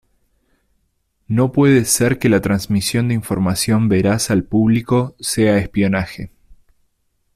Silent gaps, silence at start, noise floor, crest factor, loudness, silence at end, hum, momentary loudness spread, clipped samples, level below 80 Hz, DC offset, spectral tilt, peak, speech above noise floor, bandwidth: none; 1.3 s; -66 dBFS; 14 dB; -16 LUFS; 1.1 s; none; 7 LU; under 0.1%; -44 dBFS; under 0.1%; -5.5 dB/octave; -2 dBFS; 50 dB; 15.5 kHz